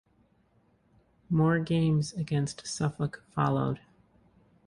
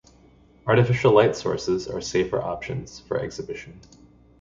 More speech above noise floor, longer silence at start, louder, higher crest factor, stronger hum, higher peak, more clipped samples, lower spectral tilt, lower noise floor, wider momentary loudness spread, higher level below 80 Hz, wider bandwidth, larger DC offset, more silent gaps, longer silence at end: first, 39 dB vs 31 dB; first, 1.3 s vs 0.65 s; second, -29 LUFS vs -23 LUFS; about the same, 18 dB vs 20 dB; neither; second, -12 dBFS vs -4 dBFS; neither; about the same, -6.5 dB/octave vs -6 dB/octave; first, -67 dBFS vs -54 dBFS; second, 8 LU vs 16 LU; second, -58 dBFS vs -50 dBFS; first, 11 kHz vs 7.6 kHz; neither; neither; first, 0.9 s vs 0.6 s